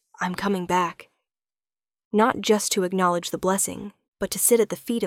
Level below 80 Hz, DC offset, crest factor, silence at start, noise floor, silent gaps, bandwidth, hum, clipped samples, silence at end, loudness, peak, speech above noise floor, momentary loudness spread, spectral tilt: -58 dBFS; under 0.1%; 20 dB; 0.2 s; under -90 dBFS; 2.05-2.11 s, 4.08-4.12 s; 18 kHz; none; under 0.1%; 0 s; -23 LUFS; -6 dBFS; over 67 dB; 10 LU; -3.5 dB/octave